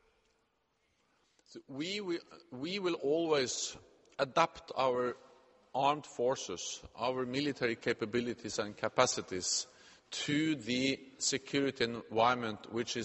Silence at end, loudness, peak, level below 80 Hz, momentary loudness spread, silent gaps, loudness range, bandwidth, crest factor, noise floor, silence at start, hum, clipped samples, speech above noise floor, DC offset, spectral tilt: 0 s; -34 LUFS; -12 dBFS; -70 dBFS; 11 LU; none; 3 LU; 8.4 kHz; 24 dB; -77 dBFS; 1.5 s; none; under 0.1%; 43 dB; under 0.1%; -3 dB/octave